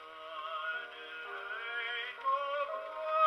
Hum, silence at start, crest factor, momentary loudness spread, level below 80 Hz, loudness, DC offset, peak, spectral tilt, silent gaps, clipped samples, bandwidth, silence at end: none; 0 s; 18 dB; 9 LU; -82 dBFS; -38 LUFS; under 0.1%; -18 dBFS; -1 dB/octave; none; under 0.1%; 12.5 kHz; 0 s